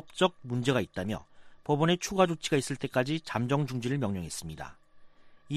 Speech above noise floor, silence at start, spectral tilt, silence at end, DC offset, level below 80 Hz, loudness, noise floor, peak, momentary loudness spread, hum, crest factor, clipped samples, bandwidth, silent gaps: 23 dB; 0.05 s; -5.5 dB/octave; 0 s; under 0.1%; -58 dBFS; -30 LUFS; -53 dBFS; -10 dBFS; 12 LU; none; 20 dB; under 0.1%; 15 kHz; none